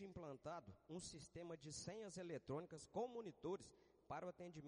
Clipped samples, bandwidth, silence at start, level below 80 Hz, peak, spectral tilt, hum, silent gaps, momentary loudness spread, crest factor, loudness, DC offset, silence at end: under 0.1%; 10 kHz; 0 s; -78 dBFS; -36 dBFS; -5 dB/octave; none; none; 6 LU; 18 dB; -53 LUFS; under 0.1%; 0 s